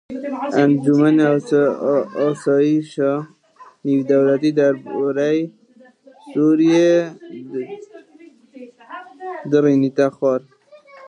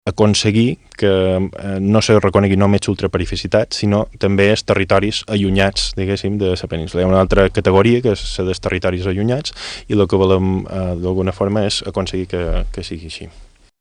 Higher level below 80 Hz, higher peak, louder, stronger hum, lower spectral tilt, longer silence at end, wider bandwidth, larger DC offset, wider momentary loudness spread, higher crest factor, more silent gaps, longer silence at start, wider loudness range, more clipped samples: second, -72 dBFS vs -32 dBFS; about the same, -2 dBFS vs 0 dBFS; about the same, -17 LUFS vs -16 LUFS; neither; first, -7.5 dB/octave vs -6 dB/octave; second, 0 s vs 0.35 s; about the same, 9.8 kHz vs 10.5 kHz; neither; first, 17 LU vs 9 LU; about the same, 16 dB vs 16 dB; neither; about the same, 0.1 s vs 0.05 s; about the same, 4 LU vs 3 LU; neither